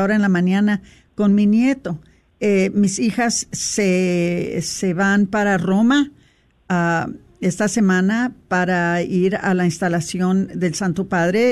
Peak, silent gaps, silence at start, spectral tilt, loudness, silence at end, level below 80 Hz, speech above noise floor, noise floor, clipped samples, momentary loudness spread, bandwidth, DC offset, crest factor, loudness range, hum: -6 dBFS; none; 0 s; -5.5 dB/octave; -18 LUFS; 0 s; -52 dBFS; 38 dB; -55 dBFS; under 0.1%; 7 LU; 13 kHz; under 0.1%; 12 dB; 1 LU; none